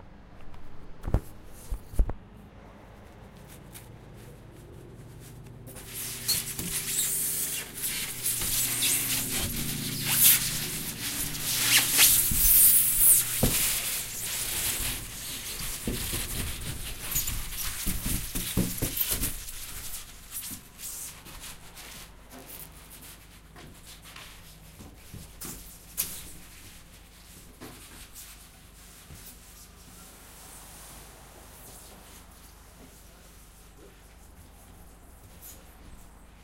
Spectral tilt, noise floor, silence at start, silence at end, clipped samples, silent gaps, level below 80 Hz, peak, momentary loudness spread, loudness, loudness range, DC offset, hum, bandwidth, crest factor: -1.5 dB/octave; -51 dBFS; 0 s; 0.05 s; under 0.1%; none; -42 dBFS; -4 dBFS; 29 LU; -25 LUFS; 27 LU; under 0.1%; none; 16 kHz; 26 dB